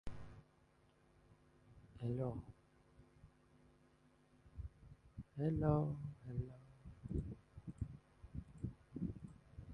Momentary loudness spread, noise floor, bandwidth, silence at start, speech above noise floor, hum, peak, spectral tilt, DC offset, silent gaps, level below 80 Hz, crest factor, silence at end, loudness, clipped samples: 22 LU; -72 dBFS; 9.6 kHz; 0.05 s; 33 dB; none; -22 dBFS; -10 dB/octave; under 0.1%; none; -58 dBFS; 24 dB; 0 s; -45 LUFS; under 0.1%